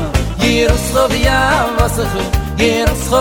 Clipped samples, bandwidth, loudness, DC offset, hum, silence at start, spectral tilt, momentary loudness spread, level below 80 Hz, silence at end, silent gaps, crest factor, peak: under 0.1%; 18.5 kHz; -14 LUFS; under 0.1%; none; 0 s; -4.5 dB/octave; 5 LU; -20 dBFS; 0 s; none; 14 dB; 0 dBFS